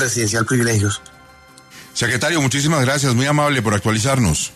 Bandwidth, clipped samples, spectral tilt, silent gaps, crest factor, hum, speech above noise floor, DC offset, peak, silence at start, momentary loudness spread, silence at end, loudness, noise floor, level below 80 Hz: 13.5 kHz; under 0.1%; -4 dB/octave; none; 12 dB; none; 28 dB; under 0.1%; -6 dBFS; 0 s; 4 LU; 0 s; -17 LUFS; -45 dBFS; -42 dBFS